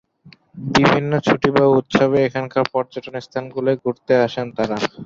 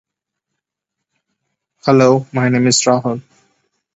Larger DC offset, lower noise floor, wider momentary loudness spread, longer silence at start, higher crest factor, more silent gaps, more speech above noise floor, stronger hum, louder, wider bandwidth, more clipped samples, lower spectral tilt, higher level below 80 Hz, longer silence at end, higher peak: neither; second, -49 dBFS vs -80 dBFS; about the same, 12 LU vs 11 LU; second, 0.25 s vs 1.85 s; about the same, 18 dB vs 18 dB; neither; second, 31 dB vs 67 dB; neither; second, -18 LUFS vs -14 LUFS; about the same, 7.6 kHz vs 8.2 kHz; neither; first, -6 dB/octave vs -4.5 dB/octave; first, -52 dBFS vs -60 dBFS; second, 0 s vs 0.75 s; about the same, 0 dBFS vs 0 dBFS